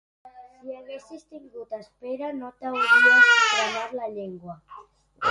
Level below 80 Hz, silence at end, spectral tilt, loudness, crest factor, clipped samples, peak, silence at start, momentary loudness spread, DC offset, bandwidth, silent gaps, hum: -70 dBFS; 0 s; -1.5 dB/octave; -19 LUFS; 20 dB; under 0.1%; -4 dBFS; 0.25 s; 26 LU; under 0.1%; 11.5 kHz; none; none